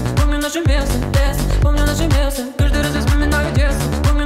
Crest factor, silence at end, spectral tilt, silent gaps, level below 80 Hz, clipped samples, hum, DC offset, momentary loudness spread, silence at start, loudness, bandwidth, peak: 12 dB; 0 s; -5.5 dB/octave; none; -18 dBFS; under 0.1%; none; under 0.1%; 2 LU; 0 s; -17 LUFS; 16 kHz; -2 dBFS